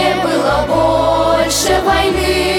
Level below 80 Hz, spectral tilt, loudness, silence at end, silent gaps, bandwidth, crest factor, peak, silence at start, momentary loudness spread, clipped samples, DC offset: -28 dBFS; -3.5 dB/octave; -13 LUFS; 0 s; none; 17.5 kHz; 12 dB; -2 dBFS; 0 s; 2 LU; under 0.1%; under 0.1%